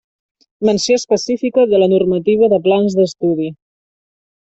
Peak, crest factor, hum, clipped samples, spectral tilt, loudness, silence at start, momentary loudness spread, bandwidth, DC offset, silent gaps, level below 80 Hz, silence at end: -2 dBFS; 12 dB; none; under 0.1%; -5.5 dB/octave; -14 LUFS; 0.6 s; 6 LU; 8.2 kHz; under 0.1%; none; -56 dBFS; 0.9 s